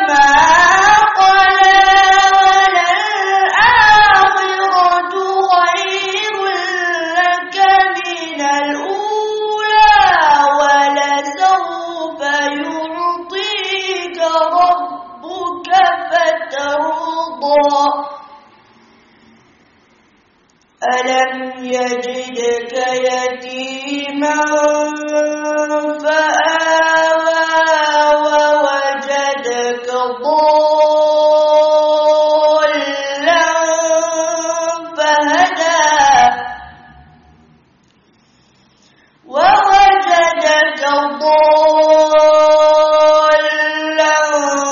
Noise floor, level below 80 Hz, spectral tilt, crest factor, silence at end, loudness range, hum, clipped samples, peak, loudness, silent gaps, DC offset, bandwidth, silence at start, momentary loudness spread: -54 dBFS; -46 dBFS; 1 dB/octave; 12 dB; 0 s; 9 LU; none; under 0.1%; 0 dBFS; -12 LUFS; none; under 0.1%; 7.4 kHz; 0 s; 11 LU